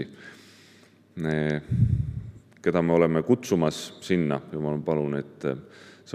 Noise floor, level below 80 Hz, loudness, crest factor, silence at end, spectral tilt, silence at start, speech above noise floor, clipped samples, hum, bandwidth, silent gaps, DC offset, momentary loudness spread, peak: -55 dBFS; -48 dBFS; -26 LUFS; 20 dB; 0 s; -7 dB/octave; 0 s; 30 dB; under 0.1%; none; 14.5 kHz; none; under 0.1%; 17 LU; -8 dBFS